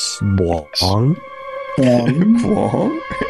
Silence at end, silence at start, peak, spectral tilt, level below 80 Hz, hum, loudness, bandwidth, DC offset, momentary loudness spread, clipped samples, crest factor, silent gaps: 0 s; 0 s; -4 dBFS; -6 dB/octave; -40 dBFS; none; -16 LUFS; 12.5 kHz; 0.2%; 10 LU; under 0.1%; 12 dB; none